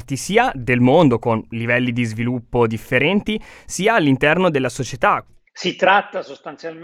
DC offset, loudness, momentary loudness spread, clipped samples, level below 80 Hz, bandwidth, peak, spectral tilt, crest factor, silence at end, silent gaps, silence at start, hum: under 0.1%; -18 LUFS; 12 LU; under 0.1%; -44 dBFS; 15 kHz; -2 dBFS; -5.5 dB/octave; 16 dB; 0 s; none; 0 s; none